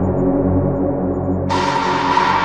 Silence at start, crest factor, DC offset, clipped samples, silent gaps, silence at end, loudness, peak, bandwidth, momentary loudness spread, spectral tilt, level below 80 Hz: 0 s; 14 dB; under 0.1%; under 0.1%; none; 0 s; -17 LUFS; -2 dBFS; 9.8 kHz; 4 LU; -6.5 dB/octave; -36 dBFS